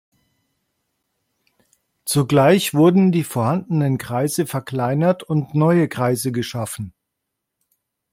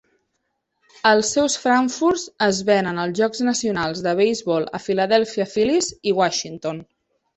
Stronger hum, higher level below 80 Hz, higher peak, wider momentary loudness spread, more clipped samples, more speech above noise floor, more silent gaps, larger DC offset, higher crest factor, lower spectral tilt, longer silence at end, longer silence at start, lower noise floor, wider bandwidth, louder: neither; about the same, -60 dBFS vs -58 dBFS; about the same, -2 dBFS vs -2 dBFS; first, 12 LU vs 6 LU; neither; first, 61 dB vs 54 dB; neither; neither; about the same, 18 dB vs 20 dB; first, -6 dB/octave vs -3.5 dB/octave; first, 1.25 s vs 0.55 s; first, 2.05 s vs 1.05 s; first, -79 dBFS vs -74 dBFS; first, 16.5 kHz vs 8.6 kHz; about the same, -19 LUFS vs -20 LUFS